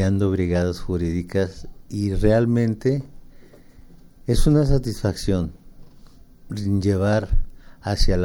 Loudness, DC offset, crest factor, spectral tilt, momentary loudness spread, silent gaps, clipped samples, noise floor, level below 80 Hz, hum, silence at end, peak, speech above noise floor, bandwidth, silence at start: -22 LUFS; under 0.1%; 16 dB; -7 dB/octave; 14 LU; none; under 0.1%; -45 dBFS; -28 dBFS; none; 0 s; -6 dBFS; 26 dB; 16.5 kHz; 0 s